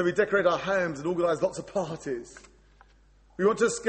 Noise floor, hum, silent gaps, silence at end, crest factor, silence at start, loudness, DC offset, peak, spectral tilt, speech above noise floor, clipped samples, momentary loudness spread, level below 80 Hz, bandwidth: -59 dBFS; none; none; 0 s; 18 dB; 0 s; -27 LUFS; under 0.1%; -10 dBFS; -5 dB/octave; 32 dB; under 0.1%; 12 LU; -60 dBFS; 8.8 kHz